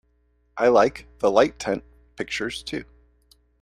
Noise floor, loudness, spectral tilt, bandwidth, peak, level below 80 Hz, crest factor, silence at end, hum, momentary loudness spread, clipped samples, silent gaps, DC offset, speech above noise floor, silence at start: -65 dBFS; -23 LUFS; -4.5 dB/octave; 13 kHz; -2 dBFS; -52 dBFS; 22 dB; 0.8 s; none; 16 LU; under 0.1%; none; under 0.1%; 43 dB; 0.55 s